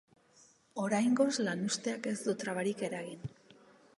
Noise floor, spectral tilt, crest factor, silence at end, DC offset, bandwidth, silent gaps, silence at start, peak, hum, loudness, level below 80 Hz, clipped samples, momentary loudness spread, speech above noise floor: -65 dBFS; -4.5 dB/octave; 20 dB; 0.7 s; under 0.1%; 11.5 kHz; none; 0.75 s; -16 dBFS; none; -34 LUFS; -74 dBFS; under 0.1%; 15 LU; 31 dB